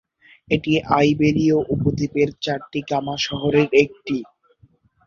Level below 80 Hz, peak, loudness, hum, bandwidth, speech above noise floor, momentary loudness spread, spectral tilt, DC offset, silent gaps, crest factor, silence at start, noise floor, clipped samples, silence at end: -48 dBFS; -2 dBFS; -20 LUFS; none; 7.2 kHz; 37 dB; 10 LU; -6.5 dB/octave; under 0.1%; none; 18 dB; 0.5 s; -57 dBFS; under 0.1%; 0.85 s